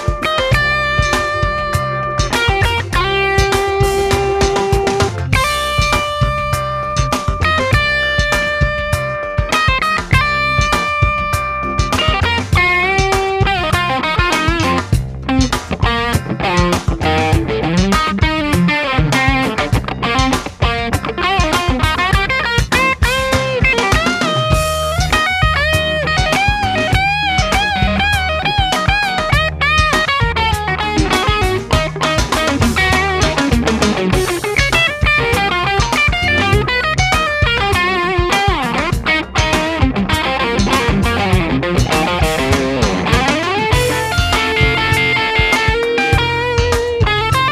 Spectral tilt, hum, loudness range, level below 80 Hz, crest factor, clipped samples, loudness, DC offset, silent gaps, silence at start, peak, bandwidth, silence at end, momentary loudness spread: -4.5 dB/octave; none; 2 LU; -24 dBFS; 14 dB; under 0.1%; -14 LUFS; under 0.1%; none; 0 s; 0 dBFS; 15.5 kHz; 0 s; 4 LU